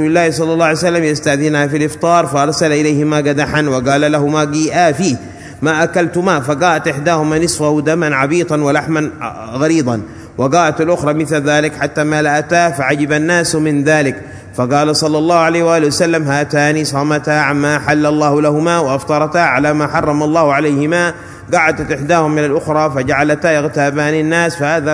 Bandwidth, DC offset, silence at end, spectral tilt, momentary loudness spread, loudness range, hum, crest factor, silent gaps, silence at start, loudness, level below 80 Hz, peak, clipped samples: 11 kHz; under 0.1%; 0 s; -5 dB/octave; 4 LU; 2 LU; none; 12 dB; none; 0 s; -13 LUFS; -46 dBFS; 0 dBFS; under 0.1%